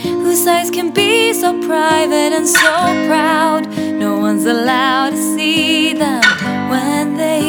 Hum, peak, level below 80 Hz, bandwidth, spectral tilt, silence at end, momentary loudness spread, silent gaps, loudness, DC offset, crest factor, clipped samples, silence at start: none; 0 dBFS; -58 dBFS; over 20 kHz; -3 dB/octave; 0 s; 5 LU; none; -13 LUFS; under 0.1%; 14 dB; under 0.1%; 0 s